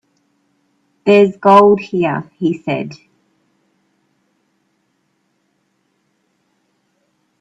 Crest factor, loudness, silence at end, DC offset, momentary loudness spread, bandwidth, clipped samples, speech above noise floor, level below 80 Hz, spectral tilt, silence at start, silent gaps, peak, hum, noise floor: 18 dB; -13 LUFS; 4.45 s; under 0.1%; 13 LU; 7.8 kHz; under 0.1%; 52 dB; -62 dBFS; -7.5 dB/octave; 1.05 s; none; 0 dBFS; none; -65 dBFS